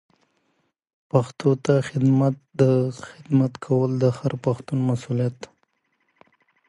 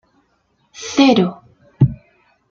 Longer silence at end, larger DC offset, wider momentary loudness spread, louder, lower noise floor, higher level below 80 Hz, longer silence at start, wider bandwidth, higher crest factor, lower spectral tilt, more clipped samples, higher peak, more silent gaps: first, 1.25 s vs 0.55 s; neither; second, 8 LU vs 17 LU; second, -22 LUFS vs -16 LUFS; first, -71 dBFS vs -63 dBFS; second, -62 dBFS vs -44 dBFS; first, 1.15 s vs 0.8 s; first, 11 kHz vs 7.6 kHz; about the same, 20 dB vs 18 dB; first, -8.5 dB/octave vs -6 dB/octave; neither; second, -4 dBFS vs 0 dBFS; neither